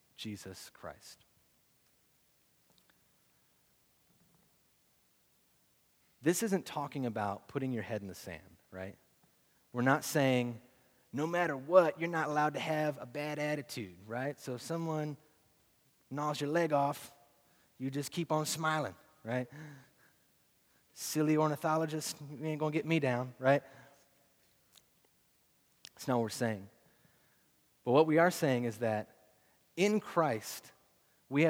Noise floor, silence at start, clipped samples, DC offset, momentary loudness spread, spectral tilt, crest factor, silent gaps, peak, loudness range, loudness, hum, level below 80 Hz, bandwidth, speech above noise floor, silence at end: -72 dBFS; 0.2 s; under 0.1%; under 0.1%; 17 LU; -5.5 dB/octave; 24 dB; none; -12 dBFS; 8 LU; -34 LUFS; none; -80 dBFS; over 20 kHz; 38 dB; 0 s